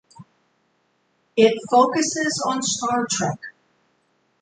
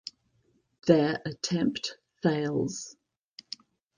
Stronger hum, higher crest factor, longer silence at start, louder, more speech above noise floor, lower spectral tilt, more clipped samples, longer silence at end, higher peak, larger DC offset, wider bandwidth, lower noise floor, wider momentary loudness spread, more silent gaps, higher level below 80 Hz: neither; about the same, 20 dB vs 24 dB; second, 0.2 s vs 0.85 s; first, -20 LUFS vs -29 LUFS; first, 47 dB vs 43 dB; second, -3 dB/octave vs -5.5 dB/octave; neither; second, 0.9 s vs 1.05 s; about the same, -4 dBFS vs -6 dBFS; neither; about the same, 9.6 kHz vs 9.8 kHz; about the same, -67 dBFS vs -70 dBFS; second, 10 LU vs 19 LU; neither; about the same, -66 dBFS vs -66 dBFS